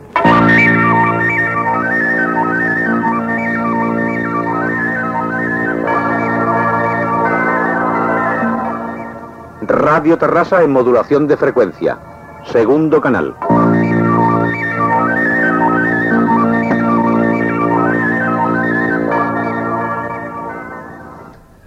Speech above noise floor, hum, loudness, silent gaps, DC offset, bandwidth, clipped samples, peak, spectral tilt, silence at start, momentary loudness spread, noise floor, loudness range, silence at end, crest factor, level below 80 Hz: 25 dB; none; -13 LUFS; none; under 0.1%; 8.6 kHz; under 0.1%; 0 dBFS; -8 dB/octave; 0 s; 9 LU; -37 dBFS; 3 LU; 0.35 s; 14 dB; -48 dBFS